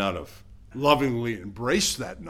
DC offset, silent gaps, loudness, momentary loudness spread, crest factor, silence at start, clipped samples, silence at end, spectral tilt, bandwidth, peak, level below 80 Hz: under 0.1%; none; -25 LUFS; 17 LU; 22 dB; 0 s; under 0.1%; 0 s; -4 dB/octave; 16.5 kHz; -4 dBFS; -48 dBFS